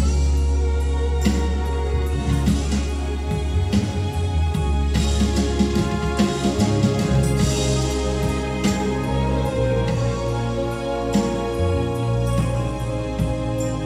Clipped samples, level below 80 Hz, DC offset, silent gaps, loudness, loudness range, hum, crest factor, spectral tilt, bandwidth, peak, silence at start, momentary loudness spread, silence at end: under 0.1%; -24 dBFS; under 0.1%; none; -22 LUFS; 2 LU; none; 16 dB; -6 dB/octave; 14 kHz; -4 dBFS; 0 s; 4 LU; 0 s